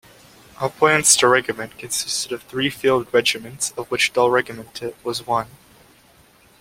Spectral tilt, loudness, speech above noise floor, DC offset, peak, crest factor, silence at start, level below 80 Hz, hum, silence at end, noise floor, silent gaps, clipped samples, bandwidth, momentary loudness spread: -2 dB/octave; -19 LUFS; 33 dB; under 0.1%; 0 dBFS; 22 dB; 0.6 s; -58 dBFS; none; 1.15 s; -53 dBFS; none; under 0.1%; 16.5 kHz; 15 LU